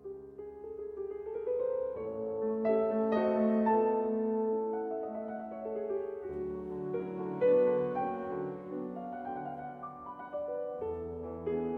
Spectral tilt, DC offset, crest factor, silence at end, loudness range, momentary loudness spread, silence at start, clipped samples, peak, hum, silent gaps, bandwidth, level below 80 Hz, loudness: -10 dB/octave; under 0.1%; 16 dB; 0 s; 8 LU; 14 LU; 0 s; under 0.1%; -18 dBFS; none; none; 4.8 kHz; -64 dBFS; -34 LUFS